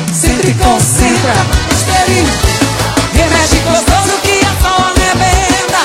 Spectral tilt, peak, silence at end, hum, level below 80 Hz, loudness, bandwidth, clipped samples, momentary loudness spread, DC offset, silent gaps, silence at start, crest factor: -3.5 dB/octave; 0 dBFS; 0 s; none; -18 dBFS; -10 LUFS; 16.5 kHz; under 0.1%; 3 LU; under 0.1%; none; 0 s; 10 dB